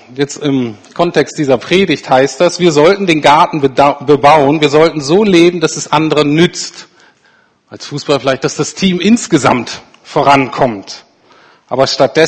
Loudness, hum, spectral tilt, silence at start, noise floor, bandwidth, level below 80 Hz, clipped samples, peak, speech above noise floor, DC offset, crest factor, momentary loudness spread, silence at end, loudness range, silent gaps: -11 LUFS; none; -5 dB/octave; 0.1 s; -51 dBFS; 11 kHz; -46 dBFS; 0.6%; 0 dBFS; 40 dB; under 0.1%; 12 dB; 13 LU; 0 s; 5 LU; none